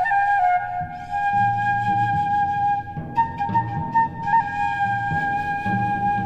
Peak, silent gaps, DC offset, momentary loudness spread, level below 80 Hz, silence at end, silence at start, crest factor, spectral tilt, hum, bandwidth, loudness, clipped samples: -8 dBFS; none; under 0.1%; 5 LU; -48 dBFS; 0 s; 0 s; 12 dB; -7 dB/octave; none; 8.4 kHz; -22 LUFS; under 0.1%